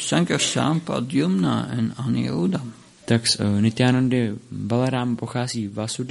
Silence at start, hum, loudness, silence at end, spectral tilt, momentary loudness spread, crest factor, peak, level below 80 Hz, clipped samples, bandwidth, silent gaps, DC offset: 0 s; none; -22 LUFS; 0 s; -5 dB/octave; 8 LU; 18 dB; -4 dBFS; -58 dBFS; under 0.1%; 11.5 kHz; none; under 0.1%